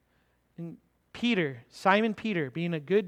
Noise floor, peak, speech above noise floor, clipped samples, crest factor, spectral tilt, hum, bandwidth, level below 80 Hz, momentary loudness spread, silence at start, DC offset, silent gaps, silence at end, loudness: -70 dBFS; -8 dBFS; 42 dB; under 0.1%; 22 dB; -6.5 dB/octave; none; 12 kHz; -70 dBFS; 19 LU; 0.6 s; under 0.1%; none; 0 s; -29 LUFS